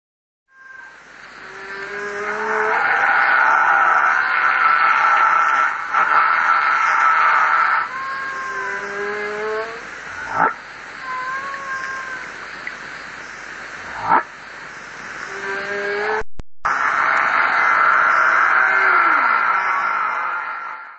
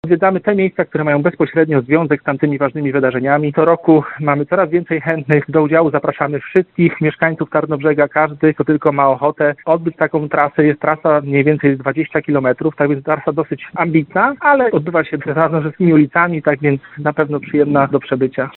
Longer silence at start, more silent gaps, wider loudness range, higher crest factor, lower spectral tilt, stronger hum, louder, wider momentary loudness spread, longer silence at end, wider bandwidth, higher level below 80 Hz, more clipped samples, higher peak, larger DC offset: first, 0.65 s vs 0.05 s; neither; first, 11 LU vs 1 LU; about the same, 18 dB vs 14 dB; second, -2.5 dB/octave vs -10.5 dB/octave; neither; about the same, -17 LUFS vs -15 LUFS; first, 18 LU vs 5 LU; about the same, 0 s vs 0.1 s; first, 8.2 kHz vs 4.2 kHz; about the same, -52 dBFS vs -54 dBFS; neither; about the same, 0 dBFS vs 0 dBFS; neither